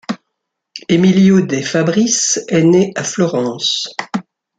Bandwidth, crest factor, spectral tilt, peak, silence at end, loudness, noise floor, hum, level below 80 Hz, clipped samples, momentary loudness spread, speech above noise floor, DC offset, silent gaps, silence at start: 9.2 kHz; 14 dB; -4.5 dB/octave; -2 dBFS; 0.35 s; -14 LUFS; -75 dBFS; none; -56 dBFS; under 0.1%; 15 LU; 62 dB; under 0.1%; none; 0.1 s